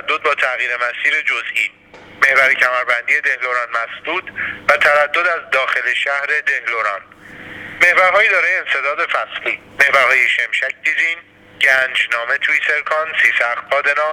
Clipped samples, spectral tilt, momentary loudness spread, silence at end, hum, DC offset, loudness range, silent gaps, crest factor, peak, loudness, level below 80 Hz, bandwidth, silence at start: under 0.1%; -1 dB/octave; 10 LU; 0 s; none; under 0.1%; 2 LU; none; 16 dB; 0 dBFS; -14 LUFS; -60 dBFS; 20 kHz; 0.05 s